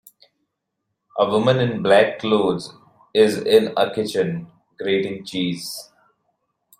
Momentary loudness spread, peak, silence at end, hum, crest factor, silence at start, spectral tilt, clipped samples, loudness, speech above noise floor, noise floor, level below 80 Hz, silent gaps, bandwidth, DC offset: 14 LU; -2 dBFS; 0.95 s; none; 20 dB; 1.15 s; -5.5 dB/octave; under 0.1%; -20 LUFS; 59 dB; -78 dBFS; -62 dBFS; none; 16 kHz; under 0.1%